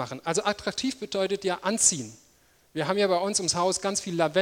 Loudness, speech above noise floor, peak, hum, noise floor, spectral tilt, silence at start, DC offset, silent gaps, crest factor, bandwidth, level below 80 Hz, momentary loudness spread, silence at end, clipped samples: -26 LUFS; 35 dB; -6 dBFS; none; -62 dBFS; -2.5 dB/octave; 0 s; under 0.1%; none; 22 dB; 16.5 kHz; -62 dBFS; 9 LU; 0 s; under 0.1%